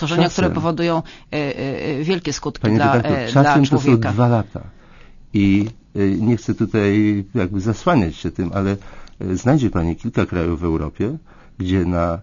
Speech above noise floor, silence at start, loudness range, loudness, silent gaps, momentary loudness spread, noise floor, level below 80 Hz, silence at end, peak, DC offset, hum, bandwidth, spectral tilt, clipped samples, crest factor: 24 dB; 0 s; 4 LU; -19 LUFS; none; 9 LU; -42 dBFS; -38 dBFS; 0 s; -2 dBFS; under 0.1%; none; 7.4 kHz; -7 dB/octave; under 0.1%; 18 dB